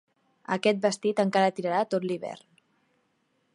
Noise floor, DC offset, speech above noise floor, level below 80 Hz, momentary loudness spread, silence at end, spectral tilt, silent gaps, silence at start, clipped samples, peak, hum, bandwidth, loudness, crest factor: -72 dBFS; under 0.1%; 46 dB; -80 dBFS; 15 LU; 1.15 s; -5 dB/octave; none; 0.5 s; under 0.1%; -10 dBFS; none; 11.5 kHz; -27 LUFS; 20 dB